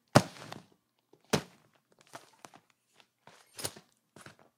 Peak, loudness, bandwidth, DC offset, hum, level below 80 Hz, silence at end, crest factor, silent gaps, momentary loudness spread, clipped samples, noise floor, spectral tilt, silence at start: -2 dBFS; -34 LUFS; 16.5 kHz; under 0.1%; none; -70 dBFS; 0.9 s; 34 dB; none; 26 LU; under 0.1%; -70 dBFS; -4.5 dB/octave; 0.15 s